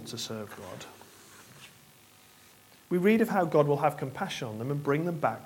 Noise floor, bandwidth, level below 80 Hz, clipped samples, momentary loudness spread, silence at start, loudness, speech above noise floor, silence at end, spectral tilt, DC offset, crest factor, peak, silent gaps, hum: -57 dBFS; 17.5 kHz; -72 dBFS; under 0.1%; 25 LU; 0 s; -29 LUFS; 29 dB; 0 s; -6 dB/octave; under 0.1%; 20 dB; -10 dBFS; none; none